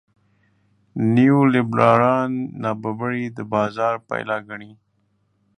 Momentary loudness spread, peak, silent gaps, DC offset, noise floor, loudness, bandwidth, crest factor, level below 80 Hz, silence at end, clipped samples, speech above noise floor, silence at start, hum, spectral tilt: 12 LU; 0 dBFS; none; under 0.1%; -66 dBFS; -20 LUFS; 9.2 kHz; 20 dB; -62 dBFS; 0.85 s; under 0.1%; 47 dB; 0.95 s; none; -8.5 dB/octave